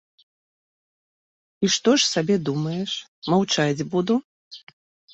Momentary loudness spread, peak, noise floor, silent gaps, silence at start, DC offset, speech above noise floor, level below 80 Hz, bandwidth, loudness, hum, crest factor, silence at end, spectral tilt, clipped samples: 12 LU; -6 dBFS; under -90 dBFS; 3.08-3.22 s, 4.24-4.51 s; 1.6 s; under 0.1%; over 68 dB; -64 dBFS; 8.2 kHz; -22 LUFS; none; 18 dB; 0.55 s; -4 dB/octave; under 0.1%